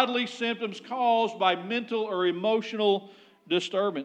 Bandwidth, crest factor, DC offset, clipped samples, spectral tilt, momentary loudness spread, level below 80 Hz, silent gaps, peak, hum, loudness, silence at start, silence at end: 9.4 kHz; 18 dB; under 0.1%; under 0.1%; -4.5 dB/octave; 5 LU; under -90 dBFS; none; -8 dBFS; none; -27 LUFS; 0 s; 0 s